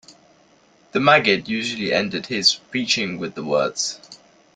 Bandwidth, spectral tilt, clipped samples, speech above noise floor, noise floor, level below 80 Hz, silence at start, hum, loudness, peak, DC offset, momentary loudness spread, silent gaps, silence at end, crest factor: 12 kHz; -3 dB/octave; under 0.1%; 35 dB; -55 dBFS; -62 dBFS; 0.1 s; none; -20 LUFS; -2 dBFS; under 0.1%; 11 LU; none; 0.4 s; 20 dB